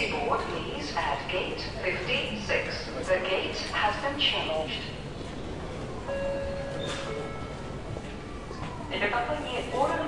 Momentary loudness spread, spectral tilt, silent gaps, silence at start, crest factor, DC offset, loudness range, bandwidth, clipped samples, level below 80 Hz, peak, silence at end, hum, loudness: 11 LU; -4.5 dB/octave; none; 0 s; 18 dB; 0.3%; 7 LU; 11.5 kHz; under 0.1%; -46 dBFS; -12 dBFS; 0 s; none; -30 LUFS